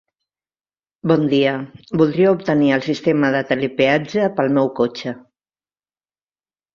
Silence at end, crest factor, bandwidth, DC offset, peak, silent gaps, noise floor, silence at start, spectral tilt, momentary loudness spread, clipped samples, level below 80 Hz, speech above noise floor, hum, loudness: 1.55 s; 18 dB; 7.2 kHz; under 0.1%; -2 dBFS; none; under -90 dBFS; 1.05 s; -7 dB/octave; 11 LU; under 0.1%; -60 dBFS; over 73 dB; 50 Hz at -45 dBFS; -18 LUFS